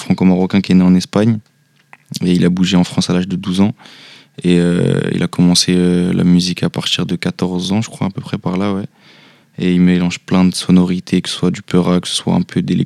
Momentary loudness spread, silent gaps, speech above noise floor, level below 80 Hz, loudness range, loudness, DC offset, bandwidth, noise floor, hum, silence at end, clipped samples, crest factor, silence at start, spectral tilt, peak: 9 LU; none; 34 dB; -50 dBFS; 4 LU; -14 LUFS; under 0.1%; 12.5 kHz; -47 dBFS; none; 0 s; under 0.1%; 14 dB; 0 s; -6 dB/octave; 0 dBFS